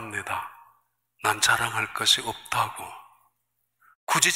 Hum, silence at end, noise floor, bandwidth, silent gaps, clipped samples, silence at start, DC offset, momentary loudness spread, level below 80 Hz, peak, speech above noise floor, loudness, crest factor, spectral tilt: 60 Hz at -60 dBFS; 0 s; -77 dBFS; 16 kHz; 3.95-4.07 s; under 0.1%; 0 s; under 0.1%; 19 LU; -64 dBFS; -2 dBFS; 52 dB; -24 LUFS; 26 dB; -0.5 dB/octave